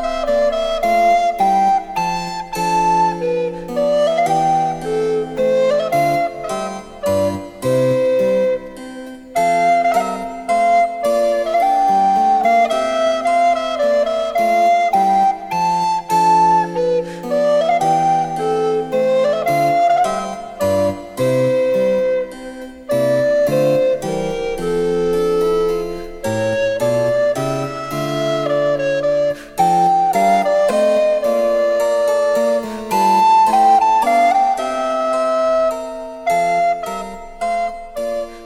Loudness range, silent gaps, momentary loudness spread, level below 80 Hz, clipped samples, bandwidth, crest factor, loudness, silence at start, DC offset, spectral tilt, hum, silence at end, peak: 4 LU; none; 9 LU; -44 dBFS; under 0.1%; 16 kHz; 12 dB; -16 LUFS; 0 s; under 0.1%; -5 dB/octave; none; 0 s; -4 dBFS